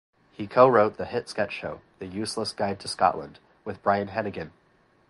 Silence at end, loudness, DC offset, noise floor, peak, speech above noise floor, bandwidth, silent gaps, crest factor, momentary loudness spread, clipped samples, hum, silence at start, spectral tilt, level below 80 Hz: 0.6 s; -25 LUFS; under 0.1%; -63 dBFS; -4 dBFS; 37 dB; 11.5 kHz; none; 22 dB; 20 LU; under 0.1%; none; 0.4 s; -5 dB/octave; -58 dBFS